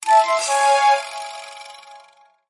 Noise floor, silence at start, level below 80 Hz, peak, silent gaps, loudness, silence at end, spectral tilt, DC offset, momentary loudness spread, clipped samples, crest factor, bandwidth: -52 dBFS; 0 s; -82 dBFS; -4 dBFS; none; -17 LUFS; 0.55 s; 2.5 dB/octave; under 0.1%; 22 LU; under 0.1%; 14 dB; 11.5 kHz